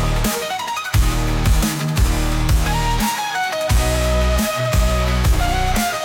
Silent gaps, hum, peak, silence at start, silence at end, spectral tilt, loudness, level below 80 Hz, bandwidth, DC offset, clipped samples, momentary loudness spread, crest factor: none; none; -6 dBFS; 0 s; 0 s; -4.5 dB/octave; -19 LUFS; -20 dBFS; 17 kHz; under 0.1%; under 0.1%; 3 LU; 12 dB